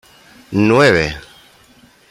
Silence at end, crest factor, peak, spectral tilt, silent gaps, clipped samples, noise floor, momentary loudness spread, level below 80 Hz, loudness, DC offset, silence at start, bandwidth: 0.9 s; 16 dB; -2 dBFS; -6 dB/octave; none; under 0.1%; -48 dBFS; 13 LU; -42 dBFS; -14 LUFS; under 0.1%; 0.5 s; 15.5 kHz